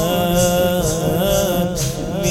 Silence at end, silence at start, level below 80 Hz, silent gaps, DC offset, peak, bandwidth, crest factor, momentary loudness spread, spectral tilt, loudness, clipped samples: 0 s; 0 s; -32 dBFS; none; under 0.1%; -4 dBFS; 17.5 kHz; 14 dB; 5 LU; -4.5 dB/octave; -17 LUFS; under 0.1%